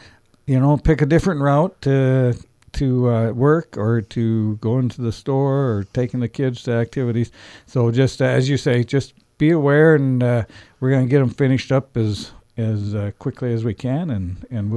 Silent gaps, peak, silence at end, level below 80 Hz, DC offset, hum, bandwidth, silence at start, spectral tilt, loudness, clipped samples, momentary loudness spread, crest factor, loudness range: none; -2 dBFS; 0 s; -40 dBFS; under 0.1%; none; 11 kHz; 0.45 s; -8 dB/octave; -19 LUFS; under 0.1%; 10 LU; 16 dB; 4 LU